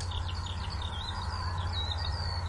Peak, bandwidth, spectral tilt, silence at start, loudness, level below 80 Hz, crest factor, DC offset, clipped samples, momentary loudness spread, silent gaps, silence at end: -22 dBFS; 11 kHz; -4.5 dB/octave; 0 s; -35 LUFS; -40 dBFS; 12 dB; under 0.1%; under 0.1%; 3 LU; none; 0 s